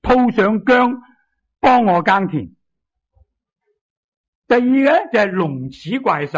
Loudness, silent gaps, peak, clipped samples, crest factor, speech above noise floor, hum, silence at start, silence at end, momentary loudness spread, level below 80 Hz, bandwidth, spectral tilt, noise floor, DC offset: -15 LUFS; 3.81-4.42 s; -4 dBFS; under 0.1%; 14 dB; 62 dB; none; 0.05 s; 0 s; 11 LU; -44 dBFS; 7.6 kHz; -7.5 dB/octave; -77 dBFS; under 0.1%